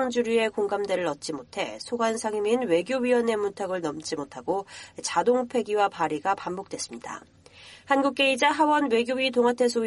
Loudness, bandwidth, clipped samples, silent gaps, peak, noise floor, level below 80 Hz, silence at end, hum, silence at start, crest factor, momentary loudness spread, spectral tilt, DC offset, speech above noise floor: -26 LUFS; 11.5 kHz; under 0.1%; none; -8 dBFS; -50 dBFS; -68 dBFS; 0 s; none; 0 s; 18 dB; 12 LU; -3.5 dB/octave; under 0.1%; 24 dB